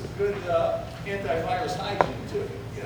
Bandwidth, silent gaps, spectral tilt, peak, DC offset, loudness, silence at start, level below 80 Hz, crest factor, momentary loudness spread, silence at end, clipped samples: over 20 kHz; none; -6 dB/octave; -2 dBFS; under 0.1%; -28 LUFS; 0 s; -46 dBFS; 26 dB; 7 LU; 0 s; under 0.1%